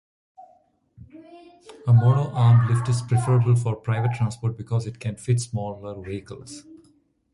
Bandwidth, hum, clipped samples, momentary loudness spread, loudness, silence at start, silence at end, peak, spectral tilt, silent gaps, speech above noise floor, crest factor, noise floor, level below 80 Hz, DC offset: 11.5 kHz; none; under 0.1%; 17 LU; -22 LUFS; 0.4 s; 0.75 s; -8 dBFS; -7 dB/octave; none; 39 dB; 16 dB; -61 dBFS; -52 dBFS; under 0.1%